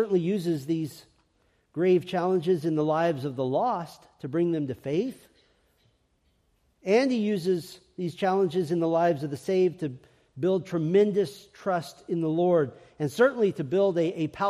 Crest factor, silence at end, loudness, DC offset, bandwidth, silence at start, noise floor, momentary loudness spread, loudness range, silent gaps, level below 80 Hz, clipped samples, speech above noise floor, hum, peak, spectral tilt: 18 dB; 0 s; -27 LUFS; under 0.1%; 14 kHz; 0 s; -69 dBFS; 10 LU; 4 LU; none; -70 dBFS; under 0.1%; 43 dB; none; -10 dBFS; -7 dB/octave